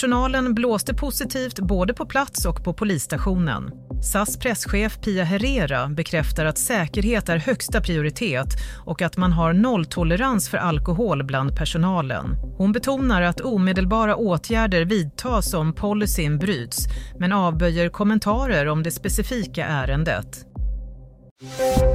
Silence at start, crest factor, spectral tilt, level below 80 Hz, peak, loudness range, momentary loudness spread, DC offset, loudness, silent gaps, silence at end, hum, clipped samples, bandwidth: 0 s; 14 dB; -5 dB/octave; -30 dBFS; -6 dBFS; 2 LU; 6 LU; under 0.1%; -22 LUFS; 21.31-21.36 s; 0 s; none; under 0.1%; 16 kHz